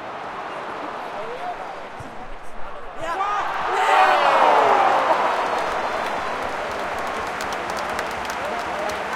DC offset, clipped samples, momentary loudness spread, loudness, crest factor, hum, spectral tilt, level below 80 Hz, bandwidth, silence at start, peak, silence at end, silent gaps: under 0.1%; under 0.1%; 19 LU; -22 LUFS; 18 dB; none; -3 dB/octave; -48 dBFS; 16.5 kHz; 0 s; -4 dBFS; 0 s; none